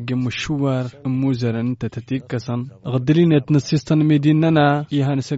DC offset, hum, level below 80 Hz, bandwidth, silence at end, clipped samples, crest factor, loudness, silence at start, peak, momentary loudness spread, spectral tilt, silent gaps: under 0.1%; none; -52 dBFS; 8 kHz; 0 s; under 0.1%; 14 dB; -19 LUFS; 0 s; -4 dBFS; 10 LU; -7 dB/octave; none